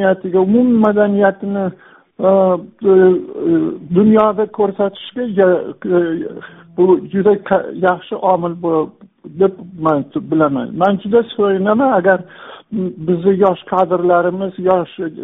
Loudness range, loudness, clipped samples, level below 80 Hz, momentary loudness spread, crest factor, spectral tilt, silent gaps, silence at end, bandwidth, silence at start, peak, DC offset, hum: 3 LU; -15 LUFS; under 0.1%; -56 dBFS; 9 LU; 14 dB; -6.5 dB/octave; none; 0 s; 3.9 kHz; 0 s; 0 dBFS; under 0.1%; none